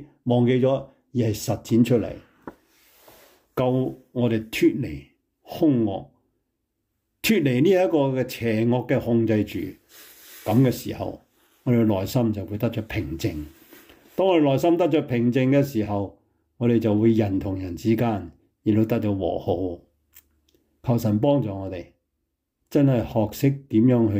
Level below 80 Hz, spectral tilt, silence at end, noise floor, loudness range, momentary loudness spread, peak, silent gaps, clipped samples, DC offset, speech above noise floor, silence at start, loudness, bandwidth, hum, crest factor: -54 dBFS; -7.5 dB/octave; 0 s; -78 dBFS; 4 LU; 14 LU; -8 dBFS; none; under 0.1%; under 0.1%; 56 dB; 0 s; -23 LUFS; 16 kHz; none; 16 dB